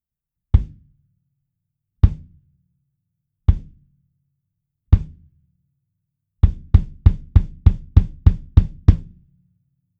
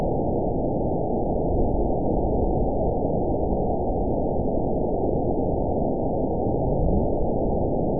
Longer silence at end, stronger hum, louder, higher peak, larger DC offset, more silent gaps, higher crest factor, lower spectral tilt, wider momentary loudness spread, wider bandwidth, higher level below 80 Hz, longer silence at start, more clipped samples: first, 0.95 s vs 0 s; neither; first, -19 LUFS vs -25 LUFS; first, 0 dBFS vs -10 dBFS; second, under 0.1% vs 2%; neither; first, 20 dB vs 12 dB; second, -10 dB/octave vs -19 dB/octave; first, 7 LU vs 1 LU; first, 4.3 kHz vs 1 kHz; first, -22 dBFS vs -30 dBFS; first, 0.55 s vs 0 s; neither